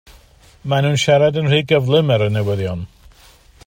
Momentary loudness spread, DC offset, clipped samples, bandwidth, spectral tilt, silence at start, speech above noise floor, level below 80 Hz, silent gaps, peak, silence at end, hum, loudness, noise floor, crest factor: 13 LU; under 0.1%; under 0.1%; 15.5 kHz; -6 dB/octave; 0.65 s; 32 dB; -48 dBFS; none; -2 dBFS; 0.8 s; none; -16 LUFS; -47 dBFS; 16 dB